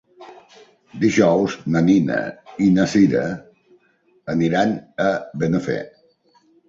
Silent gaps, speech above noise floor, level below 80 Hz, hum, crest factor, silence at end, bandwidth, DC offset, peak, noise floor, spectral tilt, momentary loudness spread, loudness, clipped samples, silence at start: none; 42 dB; -54 dBFS; none; 18 dB; 0.8 s; 7.6 kHz; under 0.1%; -2 dBFS; -60 dBFS; -6.5 dB/octave; 13 LU; -19 LUFS; under 0.1%; 0.2 s